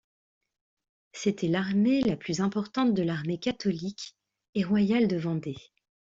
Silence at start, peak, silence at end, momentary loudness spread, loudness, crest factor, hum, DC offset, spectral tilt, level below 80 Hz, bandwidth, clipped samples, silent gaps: 1.15 s; -14 dBFS; 0.45 s; 13 LU; -28 LUFS; 14 dB; none; under 0.1%; -6.5 dB/octave; -64 dBFS; 7.8 kHz; under 0.1%; 4.49-4.53 s